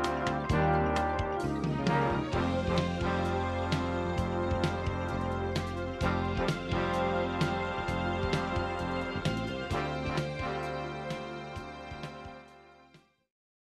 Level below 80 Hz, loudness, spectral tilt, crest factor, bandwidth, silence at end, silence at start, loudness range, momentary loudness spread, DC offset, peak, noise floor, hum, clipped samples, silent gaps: -44 dBFS; -32 LUFS; -6.5 dB/octave; 18 dB; 12.5 kHz; 0.8 s; 0 s; 7 LU; 10 LU; under 0.1%; -14 dBFS; -61 dBFS; none; under 0.1%; none